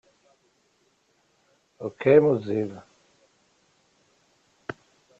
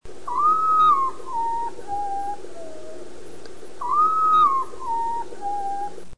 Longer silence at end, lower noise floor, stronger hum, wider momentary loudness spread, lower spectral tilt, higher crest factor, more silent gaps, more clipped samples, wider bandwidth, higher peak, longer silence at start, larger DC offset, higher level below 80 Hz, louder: first, 0.45 s vs 0 s; first, -67 dBFS vs -42 dBFS; second, none vs 60 Hz at -60 dBFS; about the same, 25 LU vs 24 LU; first, -8.5 dB/octave vs -4 dB/octave; first, 24 dB vs 14 dB; neither; neither; second, 7.6 kHz vs 10.5 kHz; first, -4 dBFS vs -8 dBFS; first, 1.8 s vs 0 s; second, under 0.1% vs 3%; second, -68 dBFS vs -56 dBFS; about the same, -23 LUFS vs -22 LUFS